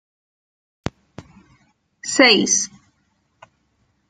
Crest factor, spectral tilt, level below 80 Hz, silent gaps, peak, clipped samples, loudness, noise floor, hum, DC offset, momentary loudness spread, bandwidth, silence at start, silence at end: 24 dB; -1.5 dB/octave; -56 dBFS; none; 0 dBFS; under 0.1%; -15 LUFS; -66 dBFS; none; under 0.1%; 20 LU; 10.5 kHz; 0.85 s; 1.45 s